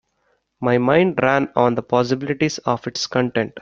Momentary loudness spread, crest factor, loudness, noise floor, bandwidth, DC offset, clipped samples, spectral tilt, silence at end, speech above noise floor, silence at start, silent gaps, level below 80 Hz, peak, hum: 7 LU; 18 dB; -19 LUFS; -67 dBFS; 7.6 kHz; under 0.1%; under 0.1%; -5.5 dB/octave; 0 s; 48 dB; 0.6 s; none; -56 dBFS; 0 dBFS; none